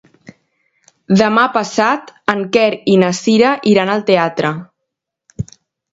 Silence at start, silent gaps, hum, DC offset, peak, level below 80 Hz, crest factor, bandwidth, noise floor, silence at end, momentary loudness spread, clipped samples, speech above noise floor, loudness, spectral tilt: 1.1 s; none; none; under 0.1%; 0 dBFS; -52 dBFS; 16 dB; 8 kHz; -77 dBFS; 0.5 s; 16 LU; under 0.1%; 64 dB; -14 LUFS; -5.5 dB/octave